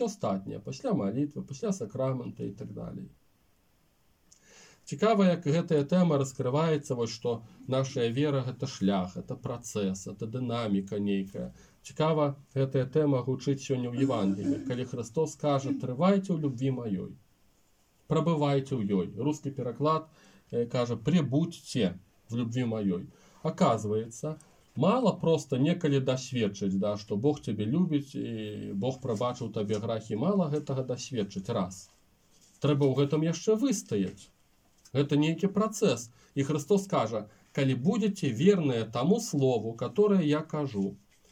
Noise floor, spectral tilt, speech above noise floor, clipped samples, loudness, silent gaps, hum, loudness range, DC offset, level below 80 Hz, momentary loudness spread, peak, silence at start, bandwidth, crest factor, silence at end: -68 dBFS; -6.5 dB/octave; 39 dB; under 0.1%; -30 LUFS; none; none; 4 LU; under 0.1%; -66 dBFS; 11 LU; -10 dBFS; 0 s; 15.5 kHz; 18 dB; 0.35 s